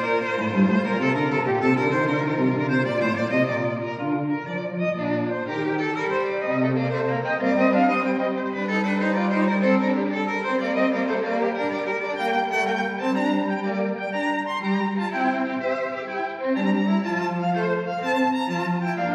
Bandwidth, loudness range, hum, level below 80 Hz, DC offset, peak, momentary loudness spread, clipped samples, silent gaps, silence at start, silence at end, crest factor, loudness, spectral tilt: 9.6 kHz; 3 LU; none; -74 dBFS; under 0.1%; -8 dBFS; 5 LU; under 0.1%; none; 0 s; 0 s; 16 dB; -23 LUFS; -7 dB/octave